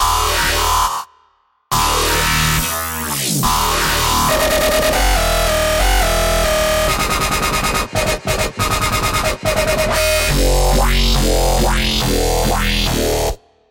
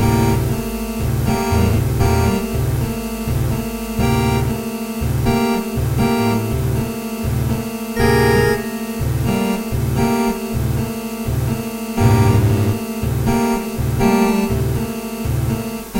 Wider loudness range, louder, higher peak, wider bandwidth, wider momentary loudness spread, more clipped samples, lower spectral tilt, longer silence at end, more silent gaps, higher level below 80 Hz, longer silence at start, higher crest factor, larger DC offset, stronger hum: about the same, 2 LU vs 2 LU; first, -15 LUFS vs -18 LUFS; about the same, -4 dBFS vs -2 dBFS; about the same, 17 kHz vs 16 kHz; second, 4 LU vs 8 LU; neither; second, -3 dB/octave vs -6.5 dB/octave; first, 0.35 s vs 0 s; neither; first, -22 dBFS vs -28 dBFS; about the same, 0 s vs 0 s; about the same, 12 dB vs 16 dB; neither; neither